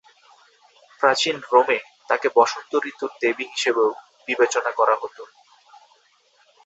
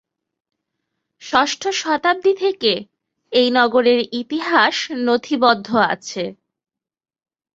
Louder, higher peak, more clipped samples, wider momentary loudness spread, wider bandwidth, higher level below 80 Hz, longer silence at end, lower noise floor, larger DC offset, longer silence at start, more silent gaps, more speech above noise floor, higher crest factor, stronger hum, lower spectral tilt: second, -21 LUFS vs -18 LUFS; about the same, -2 dBFS vs -2 dBFS; neither; about the same, 8 LU vs 9 LU; about the same, 8.2 kHz vs 7.8 kHz; second, -74 dBFS vs -64 dBFS; first, 1.4 s vs 1.2 s; second, -60 dBFS vs -77 dBFS; neither; second, 1 s vs 1.2 s; neither; second, 39 dB vs 60 dB; about the same, 22 dB vs 18 dB; neither; about the same, -2 dB/octave vs -3 dB/octave